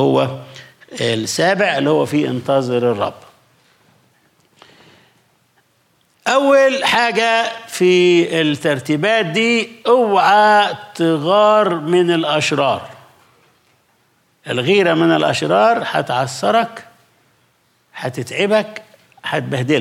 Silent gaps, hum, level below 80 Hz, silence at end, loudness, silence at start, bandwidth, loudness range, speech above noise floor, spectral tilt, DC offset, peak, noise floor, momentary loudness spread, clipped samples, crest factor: none; none; -68 dBFS; 0 s; -15 LUFS; 0 s; 15.5 kHz; 8 LU; 44 dB; -5 dB/octave; under 0.1%; -2 dBFS; -59 dBFS; 11 LU; under 0.1%; 14 dB